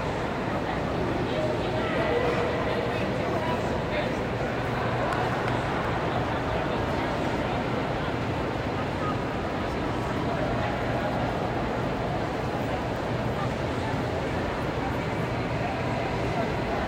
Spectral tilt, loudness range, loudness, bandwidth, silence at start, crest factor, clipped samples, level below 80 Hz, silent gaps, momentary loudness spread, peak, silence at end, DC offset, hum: -6.5 dB/octave; 2 LU; -28 LUFS; 16 kHz; 0 s; 14 dB; under 0.1%; -42 dBFS; none; 2 LU; -14 dBFS; 0 s; under 0.1%; none